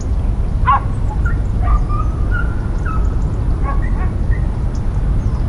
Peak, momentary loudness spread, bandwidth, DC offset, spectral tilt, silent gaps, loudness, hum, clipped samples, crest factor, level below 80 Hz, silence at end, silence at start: -2 dBFS; 5 LU; 10 kHz; under 0.1%; -8 dB/octave; none; -19 LUFS; none; under 0.1%; 12 dB; -16 dBFS; 0 s; 0 s